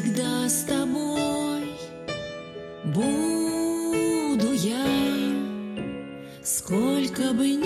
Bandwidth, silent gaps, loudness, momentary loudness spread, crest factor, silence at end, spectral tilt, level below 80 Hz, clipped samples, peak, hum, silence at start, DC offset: 15 kHz; none; -26 LUFS; 11 LU; 14 dB; 0 s; -4.5 dB/octave; -56 dBFS; under 0.1%; -12 dBFS; none; 0 s; under 0.1%